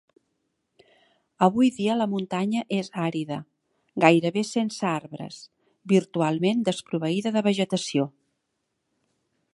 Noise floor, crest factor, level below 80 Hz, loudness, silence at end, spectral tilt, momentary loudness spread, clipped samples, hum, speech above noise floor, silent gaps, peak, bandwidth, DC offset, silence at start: -78 dBFS; 24 dB; -72 dBFS; -25 LUFS; 1.45 s; -6 dB/octave; 13 LU; under 0.1%; none; 54 dB; none; -2 dBFS; 11.5 kHz; under 0.1%; 1.4 s